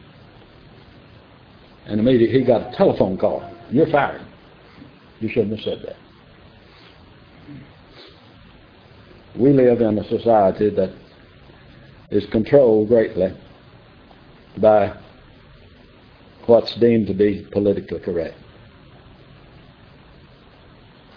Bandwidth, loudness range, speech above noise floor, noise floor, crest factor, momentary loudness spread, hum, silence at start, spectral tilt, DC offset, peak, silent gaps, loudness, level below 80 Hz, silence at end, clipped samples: 5.4 kHz; 11 LU; 30 dB; -47 dBFS; 20 dB; 20 LU; none; 1.85 s; -10 dB/octave; under 0.1%; -2 dBFS; none; -18 LUFS; -50 dBFS; 2.85 s; under 0.1%